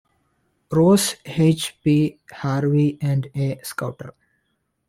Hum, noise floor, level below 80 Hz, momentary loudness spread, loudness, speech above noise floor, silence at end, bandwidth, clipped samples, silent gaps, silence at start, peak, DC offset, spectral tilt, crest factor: none; -72 dBFS; -54 dBFS; 13 LU; -21 LUFS; 52 dB; 0.8 s; 16 kHz; under 0.1%; none; 0.7 s; -6 dBFS; under 0.1%; -6 dB/octave; 16 dB